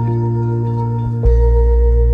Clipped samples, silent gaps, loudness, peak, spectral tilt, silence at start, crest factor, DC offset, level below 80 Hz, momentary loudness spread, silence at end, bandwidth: under 0.1%; none; -16 LUFS; -2 dBFS; -11.5 dB/octave; 0 s; 12 dB; under 0.1%; -14 dBFS; 5 LU; 0 s; 2 kHz